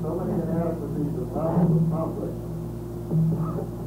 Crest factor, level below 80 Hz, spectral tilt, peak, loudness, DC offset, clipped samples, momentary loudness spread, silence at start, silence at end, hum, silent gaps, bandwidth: 14 dB; -42 dBFS; -10 dB/octave; -10 dBFS; -26 LUFS; under 0.1%; under 0.1%; 11 LU; 0 s; 0 s; none; none; 15.5 kHz